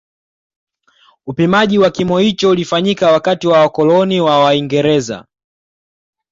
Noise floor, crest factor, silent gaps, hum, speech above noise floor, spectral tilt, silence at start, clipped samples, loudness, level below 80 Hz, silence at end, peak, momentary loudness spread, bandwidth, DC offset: -52 dBFS; 12 dB; none; none; 40 dB; -6 dB/octave; 1.25 s; under 0.1%; -12 LUFS; -52 dBFS; 1.1 s; -2 dBFS; 6 LU; 7.8 kHz; under 0.1%